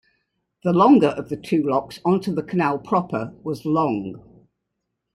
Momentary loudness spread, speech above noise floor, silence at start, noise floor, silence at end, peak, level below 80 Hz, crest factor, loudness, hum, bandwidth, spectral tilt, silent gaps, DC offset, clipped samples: 14 LU; 58 dB; 0.65 s; -79 dBFS; 0.95 s; -4 dBFS; -60 dBFS; 18 dB; -21 LUFS; none; 12 kHz; -8 dB/octave; none; under 0.1%; under 0.1%